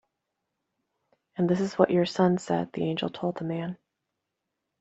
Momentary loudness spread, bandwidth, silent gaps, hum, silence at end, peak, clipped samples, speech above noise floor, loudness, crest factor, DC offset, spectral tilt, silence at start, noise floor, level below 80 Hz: 12 LU; 8 kHz; none; none; 1.05 s; -4 dBFS; under 0.1%; 57 dB; -27 LUFS; 24 dB; under 0.1%; -7 dB/octave; 1.35 s; -83 dBFS; -68 dBFS